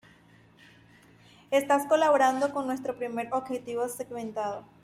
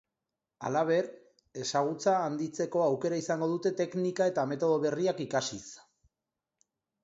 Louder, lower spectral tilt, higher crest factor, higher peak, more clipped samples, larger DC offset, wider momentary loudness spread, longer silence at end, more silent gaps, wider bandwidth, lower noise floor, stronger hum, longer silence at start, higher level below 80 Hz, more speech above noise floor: first, -28 LUFS vs -31 LUFS; about the same, -4 dB/octave vs -5 dB/octave; about the same, 18 dB vs 18 dB; about the same, -12 dBFS vs -14 dBFS; neither; neither; about the same, 11 LU vs 9 LU; second, 0.2 s vs 1.25 s; neither; first, 16 kHz vs 8 kHz; second, -58 dBFS vs -89 dBFS; neither; first, 1.5 s vs 0.6 s; about the same, -72 dBFS vs -76 dBFS; second, 30 dB vs 59 dB